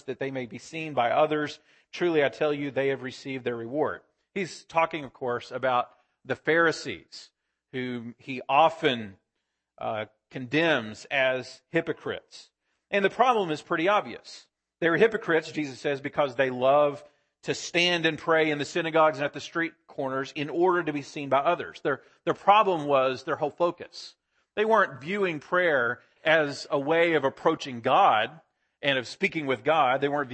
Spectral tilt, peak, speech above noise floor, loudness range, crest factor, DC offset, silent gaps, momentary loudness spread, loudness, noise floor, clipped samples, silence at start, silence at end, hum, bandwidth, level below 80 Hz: -5 dB/octave; -6 dBFS; 56 dB; 4 LU; 22 dB; under 0.1%; none; 14 LU; -26 LUFS; -82 dBFS; under 0.1%; 0.05 s; 0 s; none; 8.8 kHz; -72 dBFS